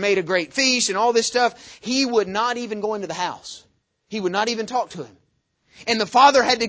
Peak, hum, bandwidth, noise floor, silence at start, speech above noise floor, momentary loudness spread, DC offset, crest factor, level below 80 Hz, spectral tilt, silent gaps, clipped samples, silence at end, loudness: -2 dBFS; none; 8 kHz; -67 dBFS; 0 s; 47 dB; 19 LU; under 0.1%; 20 dB; -62 dBFS; -2.5 dB/octave; none; under 0.1%; 0 s; -20 LUFS